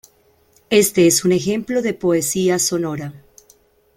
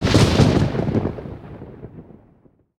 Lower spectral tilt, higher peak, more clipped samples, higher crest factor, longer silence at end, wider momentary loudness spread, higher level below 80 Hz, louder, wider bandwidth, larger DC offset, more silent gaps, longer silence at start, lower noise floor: second, -4 dB/octave vs -6 dB/octave; about the same, -2 dBFS vs 0 dBFS; neither; about the same, 16 dB vs 20 dB; about the same, 0.8 s vs 0.75 s; second, 10 LU vs 24 LU; second, -56 dBFS vs -34 dBFS; about the same, -17 LUFS vs -18 LUFS; first, 16.5 kHz vs 14 kHz; neither; neither; first, 0.7 s vs 0 s; about the same, -57 dBFS vs -55 dBFS